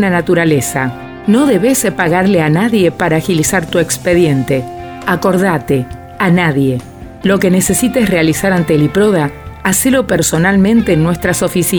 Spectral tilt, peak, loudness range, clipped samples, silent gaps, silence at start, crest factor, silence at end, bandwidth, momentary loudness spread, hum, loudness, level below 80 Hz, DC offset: -5 dB/octave; 0 dBFS; 2 LU; under 0.1%; none; 0 s; 12 dB; 0 s; over 20 kHz; 7 LU; none; -12 LUFS; -36 dBFS; 0.2%